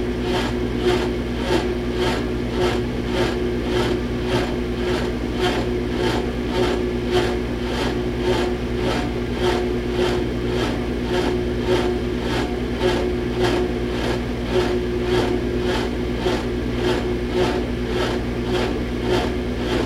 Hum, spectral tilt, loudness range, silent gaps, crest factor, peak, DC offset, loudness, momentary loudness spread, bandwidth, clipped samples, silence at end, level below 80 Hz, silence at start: 60 Hz at -25 dBFS; -6 dB/octave; 1 LU; none; 14 dB; -6 dBFS; under 0.1%; -22 LUFS; 3 LU; 14.5 kHz; under 0.1%; 0 s; -30 dBFS; 0 s